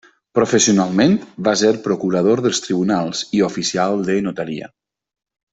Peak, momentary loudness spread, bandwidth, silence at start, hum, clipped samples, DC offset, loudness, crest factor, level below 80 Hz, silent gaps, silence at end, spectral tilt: -2 dBFS; 7 LU; 8.4 kHz; 0.35 s; none; under 0.1%; under 0.1%; -17 LUFS; 16 dB; -56 dBFS; none; 0.85 s; -4.5 dB/octave